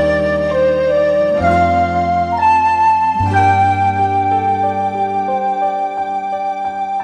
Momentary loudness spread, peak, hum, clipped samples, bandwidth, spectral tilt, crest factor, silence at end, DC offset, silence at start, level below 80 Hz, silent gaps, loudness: 7 LU; -2 dBFS; none; under 0.1%; 10 kHz; -7 dB/octave; 12 dB; 0 s; under 0.1%; 0 s; -38 dBFS; none; -15 LUFS